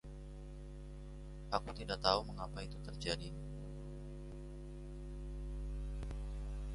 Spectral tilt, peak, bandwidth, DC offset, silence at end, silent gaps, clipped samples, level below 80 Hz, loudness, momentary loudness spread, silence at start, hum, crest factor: -5 dB/octave; -16 dBFS; 11.5 kHz; under 0.1%; 0 s; none; under 0.1%; -48 dBFS; -44 LUFS; 15 LU; 0.05 s; none; 28 dB